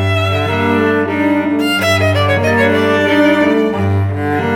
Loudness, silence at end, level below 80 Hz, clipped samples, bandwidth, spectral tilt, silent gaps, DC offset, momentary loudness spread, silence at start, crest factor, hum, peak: -13 LUFS; 0 s; -54 dBFS; under 0.1%; 17 kHz; -6 dB/octave; none; under 0.1%; 4 LU; 0 s; 12 dB; none; 0 dBFS